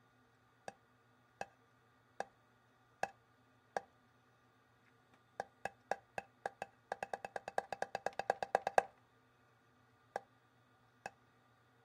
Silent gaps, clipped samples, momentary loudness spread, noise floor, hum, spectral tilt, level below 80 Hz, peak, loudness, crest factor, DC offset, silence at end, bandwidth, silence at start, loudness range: none; under 0.1%; 17 LU; -71 dBFS; none; -3 dB/octave; -84 dBFS; -10 dBFS; -44 LUFS; 36 dB; under 0.1%; 0.75 s; 15.5 kHz; 0.7 s; 11 LU